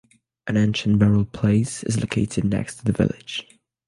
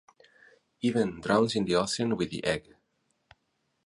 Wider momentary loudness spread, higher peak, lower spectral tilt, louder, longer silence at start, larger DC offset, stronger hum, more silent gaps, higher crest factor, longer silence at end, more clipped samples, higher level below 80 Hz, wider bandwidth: first, 11 LU vs 6 LU; first, -4 dBFS vs -10 dBFS; about the same, -6 dB/octave vs -5 dB/octave; first, -22 LUFS vs -28 LUFS; second, 0.45 s vs 0.85 s; neither; neither; neither; second, 16 dB vs 22 dB; second, 0.45 s vs 1.25 s; neither; first, -44 dBFS vs -60 dBFS; about the same, 11.5 kHz vs 11.5 kHz